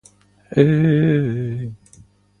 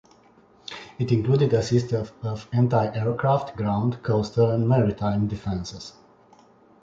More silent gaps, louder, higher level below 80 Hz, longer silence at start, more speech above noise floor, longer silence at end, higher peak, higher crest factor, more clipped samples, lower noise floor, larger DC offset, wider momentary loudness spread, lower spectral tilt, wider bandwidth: neither; first, -18 LUFS vs -24 LUFS; about the same, -50 dBFS vs -50 dBFS; second, 0.5 s vs 0.7 s; about the same, 33 dB vs 33 dB; second, 0.65 s vs 0.9 s; first, 0 dBFS vs -8 dBFS; about the same, 18 dB vs 16 dB; neither; second, -50 dBFS vs -55 dBFS; neither; second, 13 LU vs 16 LU; about the same, -9 dB/octave vs -8 dB/octave; first, 9.8 kHz vs 7.6 kHz